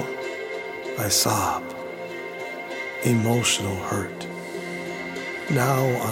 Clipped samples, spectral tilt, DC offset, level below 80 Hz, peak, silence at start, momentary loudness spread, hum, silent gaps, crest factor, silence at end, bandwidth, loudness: under 0.1%; -4 dB/octave; under 0.1%; -58 dBFS; -6 dBFS; 0 s; 13 LU; none; none; 20 dB; 0 s; 17 kHz; -25 LUFS